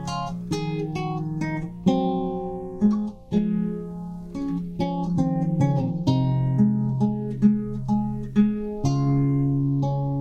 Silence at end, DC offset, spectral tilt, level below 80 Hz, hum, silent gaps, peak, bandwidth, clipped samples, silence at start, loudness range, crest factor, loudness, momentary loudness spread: 0 s; under 0.1%; -8.5 dB/octave; -44 dBFS; none; none; -8 dBFS; 8.8 kHz; under 0.1%; 0 s; 3 LU; 16 dB; -24 LUFS; 8 LU